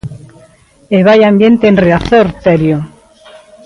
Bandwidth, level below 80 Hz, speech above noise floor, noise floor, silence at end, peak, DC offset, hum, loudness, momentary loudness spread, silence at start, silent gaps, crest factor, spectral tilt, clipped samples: 10.5 kHz; -36 dBFS; 36 dB; -43 dBFS; 0.8 s; 0 dBFS; under 0.1%; none; -9 LUFS; 11 LU; 0.05 s; none; 10 dB; -8 dB/octave; under 0.1%